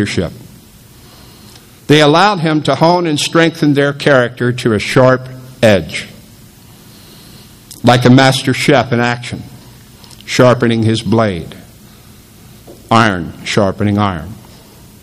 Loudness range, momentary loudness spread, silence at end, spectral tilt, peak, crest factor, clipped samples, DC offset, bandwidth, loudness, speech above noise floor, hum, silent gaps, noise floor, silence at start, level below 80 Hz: 5 LU; 15 LU; 0.65 s; -5.5 dB/octave; 0 dBFS; 14 dB; 0.3%; under 0.1%; 15.5 kHz; -12 LUFS; 28 dB; none; none; -40 dBFS; 0 s; -44 dBFS